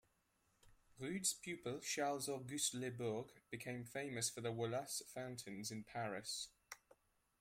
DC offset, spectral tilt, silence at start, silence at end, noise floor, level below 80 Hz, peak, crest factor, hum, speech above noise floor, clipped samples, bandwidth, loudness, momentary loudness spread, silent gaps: under 0.1%; -3 dB/octave; 0.65 s; 0.65 s; -81 dBFS; -78 dBFS; -26 dBFS; 20 dB; none; 36 dB; under 0.1%; 16 kHz; -44 LUFS; 10 LU; none